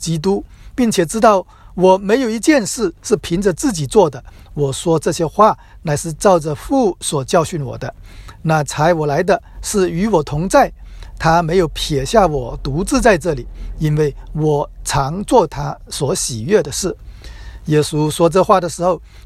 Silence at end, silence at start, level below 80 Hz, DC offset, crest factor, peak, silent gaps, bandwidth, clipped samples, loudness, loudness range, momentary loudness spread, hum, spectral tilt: 0.05 s; 0 s; -34 dBFS; under 0.1%; 16 dB; 0 dBFS; none; 14.5 kHz; under 0.1%; -16 LUFS; 3 LU; 10 LU; none; -5 dB/octave